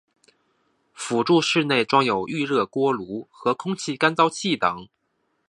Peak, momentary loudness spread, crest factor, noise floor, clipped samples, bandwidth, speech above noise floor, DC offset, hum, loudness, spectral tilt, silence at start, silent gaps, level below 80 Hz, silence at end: -2 dBFS; 9 LU; 22 dB; -72 dBFS; under 0.1%; 11.5 kHz; 50 dB; under 0.1%; none; -22 LUFS; -4.5 dB/octave; 1 s; none; -66 dBFS; 0.65 s